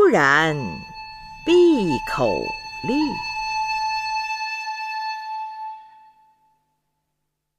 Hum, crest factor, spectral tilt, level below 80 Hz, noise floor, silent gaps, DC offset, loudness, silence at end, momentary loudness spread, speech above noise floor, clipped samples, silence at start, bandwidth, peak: none; 20 dB; -5 dB/octave; -50 dBFS; -77 dBFS; none; under 0.1%; -21 LUFS; 1.7 s; 19 LU; 58 dB; under 0.1%; 0 s; 13.5 kHz; -4 dBFS